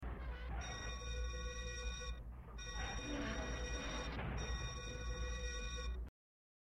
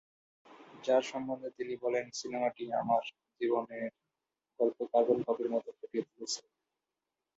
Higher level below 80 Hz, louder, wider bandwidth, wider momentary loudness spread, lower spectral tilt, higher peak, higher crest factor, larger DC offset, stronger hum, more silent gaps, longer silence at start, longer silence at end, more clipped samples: first, -46 dBFS vs -80 dBFS; second, -45 LUFS vs -34 LUFS; first, 9.6 kHz vs 8 kHz; second, 5 LU vs 10 LU; about the same, -4 dB/octave vs -4 dB/octave; second, -32 dBFS vs -14 dBFS; second, 14 dB vs 20 dB; neither; neither; neither; second, 0 s vs 0.5 s; second, 0.55 s vs 1 s; neither